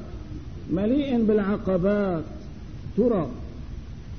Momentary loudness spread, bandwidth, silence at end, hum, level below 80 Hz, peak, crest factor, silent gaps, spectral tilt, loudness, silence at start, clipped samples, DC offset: 17 LU; 6.4 kHz; 0 s; none; -40 dBFS; -10 dBFS; 14 dB; none; -9 dB/octave; -24 LUFS; 0 s; under 0.1%; 0.6%